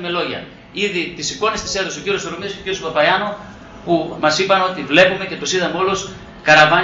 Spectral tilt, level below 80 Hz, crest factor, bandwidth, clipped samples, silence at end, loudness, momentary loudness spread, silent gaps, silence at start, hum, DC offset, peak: -3 dB/octave; -48 dBFS; 18 dB; 8 kHz; under 0.1%; 0 s; -17 LUFS; 13 LU; none; 0 s; none; under 0.1%; 0 dBFS